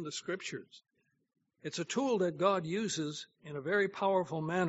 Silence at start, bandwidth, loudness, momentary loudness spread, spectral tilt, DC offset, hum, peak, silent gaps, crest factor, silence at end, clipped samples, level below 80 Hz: 0 s; 8 kHz; -34 LUFS; 13 LU; -4 dB/octave; under 0.1%; none; -16 dBFS; none; 20 dB; 0 s; under 0.1%; -80 dBFS